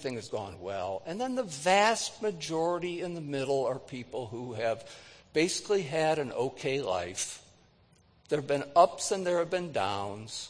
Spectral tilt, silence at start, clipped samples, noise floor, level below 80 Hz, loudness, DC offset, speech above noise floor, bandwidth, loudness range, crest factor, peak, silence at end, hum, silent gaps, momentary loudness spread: -3.5 dB/octave; 0 s; under 0.1%; -63 dBFS; -68 dBFS; -31 LUFS; under 0.1%; 33 dB; 10.5 kHz; 3 LU; 22 dB; -8 dBFS; 0 s; none; none; 14 LU